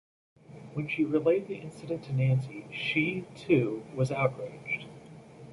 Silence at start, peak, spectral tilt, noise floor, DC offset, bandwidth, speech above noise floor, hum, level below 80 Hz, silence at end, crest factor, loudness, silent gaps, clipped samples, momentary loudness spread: 0.5 s; -12 dBFS; -7.5 dB/octave; -49 dBFS; under 0.1%; 11.5 kHz; 20 dB; none; -66 dBFS; 0 s; 20 dB; -30 LUFS; none; under 0.1%; 15 LU